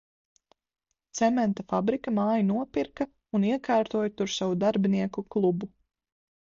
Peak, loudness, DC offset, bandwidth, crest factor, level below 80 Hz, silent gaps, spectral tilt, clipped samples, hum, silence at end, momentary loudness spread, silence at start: -12 dBFS; -27 LUFS; under 0.1%; 7.6 kHz; 16 dB; -64 dBFS; none; -6 dB/octave; under 0.1%; none; 0.8 s; 7 LU; 1.15 s